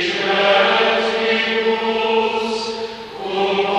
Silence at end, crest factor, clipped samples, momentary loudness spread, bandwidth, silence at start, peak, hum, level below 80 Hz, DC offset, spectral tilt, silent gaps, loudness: 0 s; 16 dB; under 0.1%; 11 LU; 10.5 kHz; 0 s; -2 dBFS; none; -56 dBFS; under 0.1%; -3.5 dB/octave; none; -17 LUFS